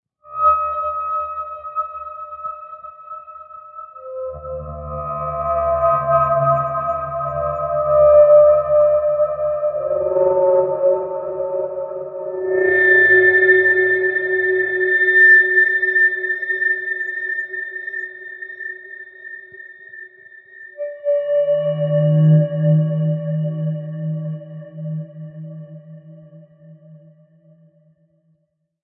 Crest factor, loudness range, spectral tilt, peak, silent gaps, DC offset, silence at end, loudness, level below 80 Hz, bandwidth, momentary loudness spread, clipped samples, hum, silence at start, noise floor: 16 dB; 17 LU; -10.5 dB/octave; -2 dBFS; none; under 0.1%; 1.85 s; -16 LUFS; -50 dBFS; 3.8 kHz; 24 LU; under 0.1%; none; 0.25 s; -68 dBFS